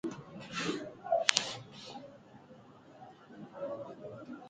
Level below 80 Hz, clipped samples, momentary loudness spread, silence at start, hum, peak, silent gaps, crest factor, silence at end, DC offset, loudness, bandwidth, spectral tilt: -76 dBFS; under 0.1%; 27 LU; 0.05 s; none; 0 dBFS; none; 38 dB; 0 s; under 0.1%; -35 LUFS; 9.4 kHz; -2 dB/octave